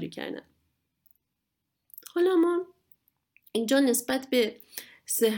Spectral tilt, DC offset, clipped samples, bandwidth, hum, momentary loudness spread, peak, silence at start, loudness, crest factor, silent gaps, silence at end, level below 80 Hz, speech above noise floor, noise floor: -3 dB/octave; under 0.1%; under 0.1%; 19 kHz; none; 18 LU; -12 dBFS; 0 s; -27 LUFS; 16 dB; none; 0 s; -76 dBFS; 56 dB; -82 dBFS